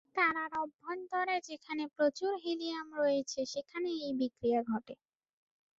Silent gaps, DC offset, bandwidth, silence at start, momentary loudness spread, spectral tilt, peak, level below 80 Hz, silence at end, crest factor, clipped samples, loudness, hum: 0.74-0.79 s; under 0.1%; 7.8 kHz; 0.15 s; 9 LU; -2 dB/octave; -16 dBFS; -76 dBFS; 0.85 s; 18 dB; under 0.1%; -35 LUFS; none